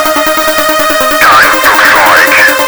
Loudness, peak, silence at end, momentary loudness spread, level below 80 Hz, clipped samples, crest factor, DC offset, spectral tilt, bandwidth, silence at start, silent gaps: -4 LUFS; 0 dBFS; 0 s; 5 LU; -36 dBFS; 4%; 6 dB; under 0.1%; -1 dB/octave; over 20 kHz; 0 s; none